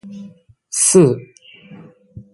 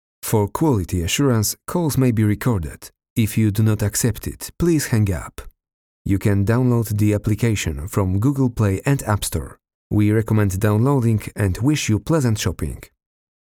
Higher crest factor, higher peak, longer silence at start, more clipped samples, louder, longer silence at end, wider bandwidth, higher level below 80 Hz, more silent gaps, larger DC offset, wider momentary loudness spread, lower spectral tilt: about the same, 18 dB vs 16 dB; first, 0 dBFS vs -4 dBFS; second, 0.05 s vs 0.25 s; neither; first, -14 LUFS vs -20 LUFS; second, 0.15 s vs 0.55 s; second, 12 kHz vs 18.5 kHz; second, -58 dBFS vs -38 dBFS; second, none vs 3.10-3.16 s, 5.74-6.05 s, 9.74-9.90 s; neither; first, 25 LU vs 10 LU; about the same, -5 dB/octave vs -6 dB/octave